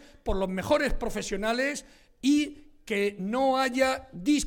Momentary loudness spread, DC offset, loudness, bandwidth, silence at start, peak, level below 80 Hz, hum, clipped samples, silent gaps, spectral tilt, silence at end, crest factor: 8 LU; under 0.1%; -28 LUFS; 17 kHz; 0 s; -10 dBFS; -42 dBFS; none; under 0.1%; none; -4 dB/octave; 0 s; 16 dB